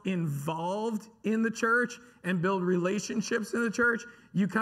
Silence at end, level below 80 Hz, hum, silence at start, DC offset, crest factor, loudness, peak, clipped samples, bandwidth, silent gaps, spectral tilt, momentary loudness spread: 0 s; -72 dBFS; none; 0.05 s; under 0.1%; 16 dB; -30 LUFS; -14 dBFS; under 0.1%; 15 kHz; none; -5.5 dB/octave; 8 LU